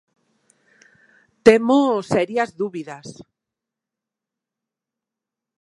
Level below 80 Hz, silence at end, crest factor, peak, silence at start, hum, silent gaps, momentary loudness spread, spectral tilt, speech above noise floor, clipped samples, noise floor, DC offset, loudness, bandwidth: -62 dBFS; 2.5 s; 22 dB; 0 dBFS; 1.45 s; none; none; 21 LU; -5.5 dB/octave; 68 dB; under 0.1%; -86 dBFS; under 0.1%; -18 LUFS; 11.5 kHz